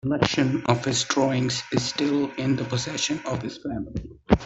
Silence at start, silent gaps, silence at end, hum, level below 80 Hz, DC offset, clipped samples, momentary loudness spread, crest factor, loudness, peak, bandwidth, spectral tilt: 0.05 s; none; 0 s; none; -44 dBFS; under 0.1%; under 0.1%; 10 LU; 22 dB; -25 LUFS; -4 dBFS; 8.4 kHz; -4.5 dB/octave